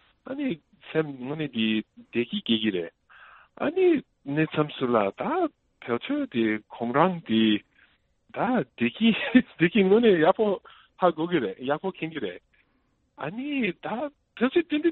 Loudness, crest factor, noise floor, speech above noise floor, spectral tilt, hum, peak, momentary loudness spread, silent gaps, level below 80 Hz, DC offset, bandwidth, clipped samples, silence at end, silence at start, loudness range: -26 LUFS; 22 dB; -70 dBFS; 45 dB; -10 dB/octave; none; -4 dBFS; 12 LU; none; -66 dBFS; under 0.1%; 4.2 kHz; under 0.1%; 0 s; 0.25 s; 7 LU